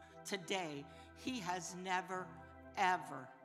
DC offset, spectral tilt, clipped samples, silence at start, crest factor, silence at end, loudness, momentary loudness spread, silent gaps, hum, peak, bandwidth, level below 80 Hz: under 0.1%; -3 dB/octave; under 0.1%; 0 s; 22 dB; 0 s; -42 LUFS; 15 LU; none; none; -20 dBFS; 16 kHz; -78 dBFS